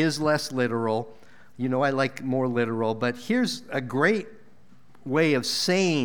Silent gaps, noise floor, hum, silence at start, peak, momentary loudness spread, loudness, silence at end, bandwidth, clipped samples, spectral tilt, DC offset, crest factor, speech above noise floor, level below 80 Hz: none; -57 dBFS; none; 0 s; -8 dBFS; 8 LU; -25 LUFS; 0 s; over 20 kHz; under 0.1%; -5 dB/octave; 0.5%; 18 dB; 33 dB; -68 dBFS